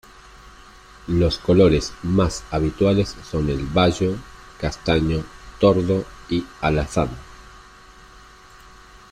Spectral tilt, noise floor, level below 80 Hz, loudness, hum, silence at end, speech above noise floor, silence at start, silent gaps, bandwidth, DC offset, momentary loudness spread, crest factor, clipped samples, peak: -6.5 dB/octave; -46 dBFS; -36 dBFS; -21 LUFS; none; 0.15 s; 26 dB; 0.45 s; none; 12 kHz; under 0.1%; 11 LU; 18 dB; under 0.1%; -4 dBFS